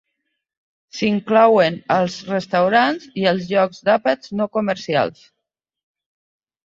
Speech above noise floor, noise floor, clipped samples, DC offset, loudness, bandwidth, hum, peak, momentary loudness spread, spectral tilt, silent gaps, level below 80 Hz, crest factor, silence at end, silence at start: 58 dB; -76 dBFS; under 0.1%; under 0.1%; -18 LUFS; 7.8 kHz; none; -2 dBFS; 9 LU; -5.5 dB/octave; none; -62 dBFS; 18 dB; 1.55 s; 0.95 s